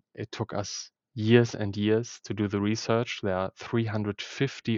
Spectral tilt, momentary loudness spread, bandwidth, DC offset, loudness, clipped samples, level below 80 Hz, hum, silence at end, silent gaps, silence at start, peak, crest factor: -6 dB/octave; 13 LU; 7.6 kHz; under 0.1%; -28 LUFS; under 0.1%; -66 dBFS; none; 0 s; none; 0.15 s; -6 dBFS; 22 dB